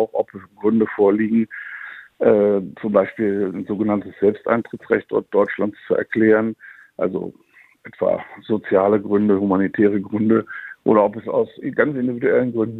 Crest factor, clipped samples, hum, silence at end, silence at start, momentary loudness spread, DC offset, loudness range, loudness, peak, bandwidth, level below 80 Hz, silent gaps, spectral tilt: 18 dB; under 0.1%; none; 0 s; 0 s; 10 LU; under 0.1%; 3 LU; -20 LUFS; -2 dBFS; 4.1 kHz; -62 dBFS; none; -10 dB/octave